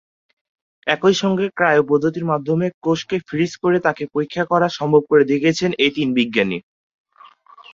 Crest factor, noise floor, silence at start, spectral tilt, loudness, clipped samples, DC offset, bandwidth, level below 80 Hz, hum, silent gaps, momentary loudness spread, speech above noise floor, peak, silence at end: 18 dB; -48 dBFS; 0.85 s; -5.5 dB/octave; -18 LUFS; under 0.1%; under 0.1%; 7.6 kHz; -58 dBFS; none; 2.74-2.81 s; 8 LU; 30 dB; 0 dBFS; 1.15 s